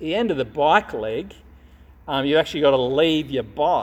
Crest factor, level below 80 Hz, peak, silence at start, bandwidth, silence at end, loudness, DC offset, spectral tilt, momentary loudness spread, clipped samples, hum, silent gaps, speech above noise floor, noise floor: 20 dB; -48 dBFS; -2 dBFS; 0 s; 15 kHz; 0 s; -21 LUFS; under 0.1%; -5.5 dB/octave; 9 LU; under 0.1%; none; none; 27 dB; -48 dBFS